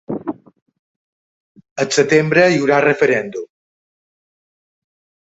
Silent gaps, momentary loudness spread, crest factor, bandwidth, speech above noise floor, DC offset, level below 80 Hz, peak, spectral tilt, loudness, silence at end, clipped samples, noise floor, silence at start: 0.62-0.66 s, 0.79-1.55 s, 1.71-1.76 s; 18 LU; 18 dB; 8.2 kHz; over 76 dB; under 0.1%; -62 dBFS; 0 dBFS; -5 dB/octave; -15 LUFS; 1.85 s; under 0.1%; under -90 dBFS; 0.1 s